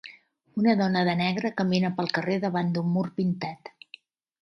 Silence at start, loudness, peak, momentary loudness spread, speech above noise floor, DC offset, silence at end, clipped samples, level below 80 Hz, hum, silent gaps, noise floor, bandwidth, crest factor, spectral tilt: 0.05 s; -26 LUFS; -10 dBFS; 13 LU; 29 dB; under 0.1%; 0.75 s; under 0.1%; -70 dBFS; none; none; -54 dBFS; 6.4 kHz; 18 dB; -7 dB/octave